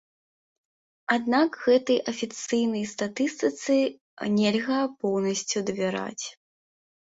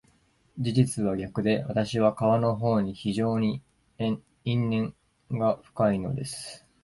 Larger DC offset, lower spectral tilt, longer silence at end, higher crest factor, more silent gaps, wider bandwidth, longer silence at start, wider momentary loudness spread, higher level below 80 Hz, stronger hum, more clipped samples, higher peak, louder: neither; second, -4 dB/octave vs -7 dB/octave; first, 0.8 s vs 0.25 s; about the same, 18 dB vs 18 dB; first, 4.01-4.17 s vs none; second, 8 kHz vs 11.5 kHz; first, 1.1 s vs 0.55 s; about the same, 10 LU vs 11 LU; second, -70 dBFS vs -56 dBFS; neither; neither; about the same, -8 dBFS vs -8 dBFS; about the same, -26 LUFS vs -27 LUFS